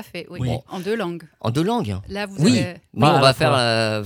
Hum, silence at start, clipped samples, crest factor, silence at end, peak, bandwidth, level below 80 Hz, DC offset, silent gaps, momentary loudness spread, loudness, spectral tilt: none; 0 s; under 0.1%; 20 dB; 0 s; 0 dBFS; 17.5 kHz; -50 dBFS; under 0.1%; none; 13 LU; -20 LUFS; -5.5 dB/octave